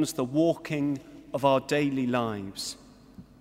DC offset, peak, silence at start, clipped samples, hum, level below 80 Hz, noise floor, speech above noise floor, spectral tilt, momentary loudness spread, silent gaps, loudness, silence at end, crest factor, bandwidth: under 0.1%; -8 dBFS; 0 s; under 0.1%; none; -62 dBFS; -50 dBFS; 23 dB; -5.5 dB/octave; 12 LU; none; -28 LUFS; 0.2 s; 20 dB; 16 kHz